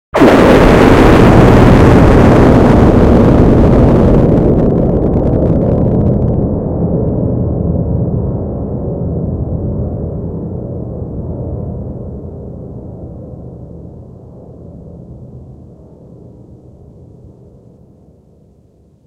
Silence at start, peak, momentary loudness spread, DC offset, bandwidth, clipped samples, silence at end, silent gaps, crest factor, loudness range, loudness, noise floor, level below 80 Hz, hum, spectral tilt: 0.15 s; 0 dBFS; 22 LU; under 0.1%; 14 kHz; 1%; 3.55 s; none; 10 dB; 23 LU; -10 LUFS; -47 dBFS; -20 dBFS; none; -8.5 dB/octave